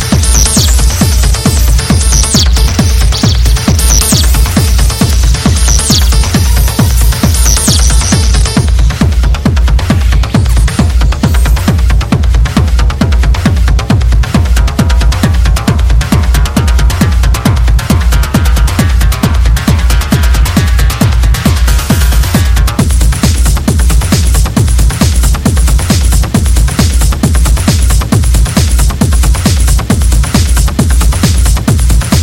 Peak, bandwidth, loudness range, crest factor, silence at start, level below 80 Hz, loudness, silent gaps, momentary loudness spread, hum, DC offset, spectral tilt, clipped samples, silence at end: 0 dBFS; 17 kHz; 2 LU; 6 dB; 0 s; -8 dBFS; -9 LUFS; none; 3 LU; none; under 0.1%; -4.5 dB/octave; 0.5%; 0 s